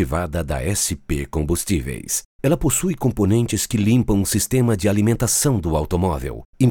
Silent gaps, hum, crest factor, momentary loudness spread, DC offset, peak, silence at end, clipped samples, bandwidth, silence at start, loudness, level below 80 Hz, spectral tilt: 2.25-2.39 s, 6.45-6.53 s; none; 16 dB; 7 LU; under 0.1%; -4 dBFS; 0 s; under 0.1%; 18.5 kHz; 0 s; -20 LUFS; -32 dBFS; -5 dB/octave